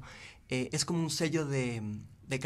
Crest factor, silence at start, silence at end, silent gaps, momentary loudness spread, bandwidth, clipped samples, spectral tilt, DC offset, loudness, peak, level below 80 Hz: 16 dB; 0 s; 0 s; none; 14 LU; 14.5 kHz; under 0.1%; -4.5 dB/octave; under 0.1%; -33 LUFS; -18 dBFS; -62 dBFS